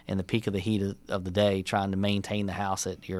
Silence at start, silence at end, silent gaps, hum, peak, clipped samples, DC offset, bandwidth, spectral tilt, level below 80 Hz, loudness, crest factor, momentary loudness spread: 0.1 s; 0 s; none; none; -10 dBFS; under 0.1%; under 0.1%; 15 kHz; -5.5 dB/octave; -58 dBFS; -29 LUFS; 18 dB; 6 LU